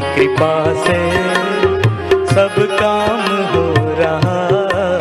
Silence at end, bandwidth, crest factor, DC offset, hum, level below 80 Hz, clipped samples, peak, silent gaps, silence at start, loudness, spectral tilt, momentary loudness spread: 0 s; 13.5 kHz; 12 dB; under 0.1%; none; -44 dBFS; under 0.1%; -2 dBFS; none; 0 s; -14 LUFS; -6 dB/octave; 3 LU